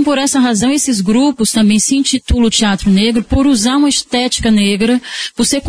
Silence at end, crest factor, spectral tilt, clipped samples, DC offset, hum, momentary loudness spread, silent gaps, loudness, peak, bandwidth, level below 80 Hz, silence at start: 0 s; 10 dB; -3.5 dB/octave; under 0.1%; under 0.1%; none; 3 LU; none; -12 LUFS; 0 dBFS; 11 kHz; -28 dBFS; 0 s